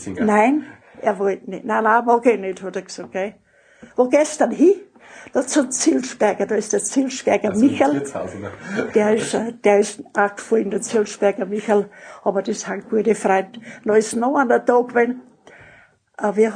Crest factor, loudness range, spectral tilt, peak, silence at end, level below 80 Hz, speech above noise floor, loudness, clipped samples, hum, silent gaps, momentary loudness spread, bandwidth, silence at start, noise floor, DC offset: 18 dB; 2 LU; -4.5 dB/octave; -2 dBFS; 0 s; -64 dBFS; 32 dB; -19 LUFS; under 0.1%; none; none; 11 LU; 10.5 kHz; 0 s; -51 dBFS; under 0.1%